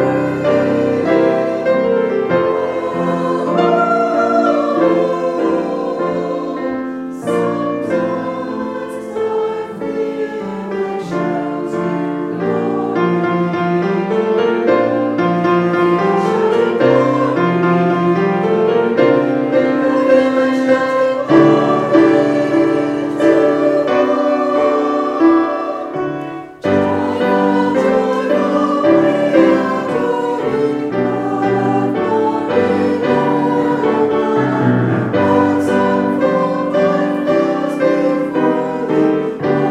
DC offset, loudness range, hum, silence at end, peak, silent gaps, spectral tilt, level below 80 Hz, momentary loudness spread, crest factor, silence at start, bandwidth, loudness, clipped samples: under 0.1%; 7 LU; none; 0 s; 0 dBFS; none; -7.5 dB/octave; -56 dBFS; 8 LU; 14 dB; 0 s; 11 kHz; -15 LUFS; under 0.1%